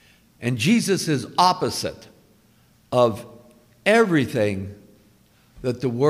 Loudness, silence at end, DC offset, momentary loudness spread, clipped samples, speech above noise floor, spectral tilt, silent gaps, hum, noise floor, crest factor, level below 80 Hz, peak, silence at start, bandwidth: -21 LUFS; 0 s; under 0.1%; 13 LU; under 0.1%; 37 dB; -5 dB/octave; none; none; -57 dBFS; 20 dB; -58 dBFS; -2 dBFS; 0.4 s; 16 kHz